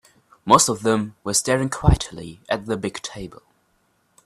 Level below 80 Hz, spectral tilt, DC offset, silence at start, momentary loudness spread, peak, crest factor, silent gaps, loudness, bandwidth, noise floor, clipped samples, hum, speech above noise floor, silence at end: -34 dBFS; -4 dB/octave; under 0.1%; 0.45 s; 20 LU; 0 dBFS; 22 dB; none; -21 LUFS; 14.5 kHz; -65 dBFS; under 0.1%; none; 44 dB; 0.9 s